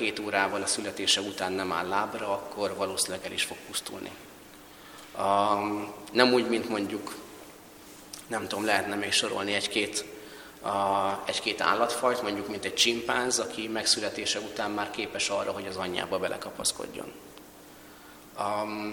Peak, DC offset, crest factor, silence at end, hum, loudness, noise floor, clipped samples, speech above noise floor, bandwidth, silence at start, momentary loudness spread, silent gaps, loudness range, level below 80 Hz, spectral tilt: -4 dBFS; under 0.1%; 26 dB; 0 s; none; -28 LUFS; -50 dBFS; under 0.1%; 21 dB; 19 kHz; 0 s; 22 LU; none; 5 LU; -64 dBFS; -2 dB/octave